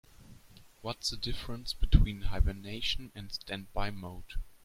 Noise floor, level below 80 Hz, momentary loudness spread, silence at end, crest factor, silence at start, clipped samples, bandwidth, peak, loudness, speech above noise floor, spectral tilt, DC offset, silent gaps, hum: -56 dBFS; -34 dBFS; 16 LU; 0.15 s; 24 dB; 0.2 s; under 0.1%; 15.5 kHz; -8 dBFS; -35 LUFS; 25 dB; -5 dB/octave; under 0.1%; none; none